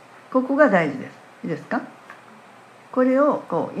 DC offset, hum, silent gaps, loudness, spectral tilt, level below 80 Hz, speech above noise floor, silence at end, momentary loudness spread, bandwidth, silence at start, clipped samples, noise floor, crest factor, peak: under 0.1%; none; none; -21 LUFS; -7.5 dB/octave; -78 dBFS; 27 dB; 0 s; 18 LU; 9.4 kHz; 0.3 s; under 0.1%; -47 dBFS; 22 dB; -2 dBFS